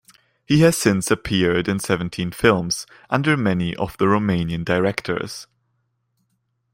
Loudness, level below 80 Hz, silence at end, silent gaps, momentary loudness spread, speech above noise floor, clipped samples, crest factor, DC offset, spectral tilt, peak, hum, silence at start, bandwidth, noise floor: -20 LUFS; -48 dBFS; 1.3 s; none; 10 LU; 51 dB; under 0.1%; 20 dB; under 0.1%; -5 dB/octave; -2 dBFS; none; 0.5 s; 16.5 kHz; -71 dBFS